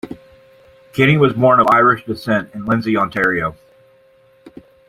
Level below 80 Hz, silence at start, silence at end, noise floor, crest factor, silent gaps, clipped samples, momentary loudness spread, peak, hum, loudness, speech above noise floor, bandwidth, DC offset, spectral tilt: -50 dBFS; 0.05 s; 0.4 s; -52 dBFS; 16 dB; none; under 0.1%; 14 LU; -2 dBFS; none; -15 LUFS; 37 dB; 15.5 kHz; under 0.1%; -7.5 dB/octave